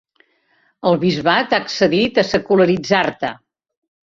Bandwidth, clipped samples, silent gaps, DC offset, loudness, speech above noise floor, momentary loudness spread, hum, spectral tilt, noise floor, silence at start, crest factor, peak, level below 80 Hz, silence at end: 7.6 kHz; under 0.1%; none; under 0.1%; -17 LUFS; 45 dB; 7 LU; none; -5.5 dB/octave; -61 dBFS; 0.85 s; 18 dB; -2 dBFS; -54 dBFS; 0.8 s